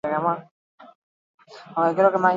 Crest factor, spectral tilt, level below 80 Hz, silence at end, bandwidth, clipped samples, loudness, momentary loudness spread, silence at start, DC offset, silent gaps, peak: 18 dB; -7.5 dB/octave; -74 dBFS; 0 s; 7.6 kHz; under 0.1%; -22 LUFS; 13 LU; 0.05 s; under 0.1%; 0.51-0.78 s, 0.95-1.38 s; -6 dBFS